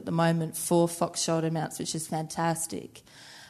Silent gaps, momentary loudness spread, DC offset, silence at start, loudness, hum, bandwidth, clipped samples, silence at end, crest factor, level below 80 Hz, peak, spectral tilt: none; 15 LU; under 0.1%; 0 s; -28 LUFS; none; 13.5 kHz; under 0.1%; 0 s; 18 dB; -68 dBFS; -12 dBFS; -5 dB/octave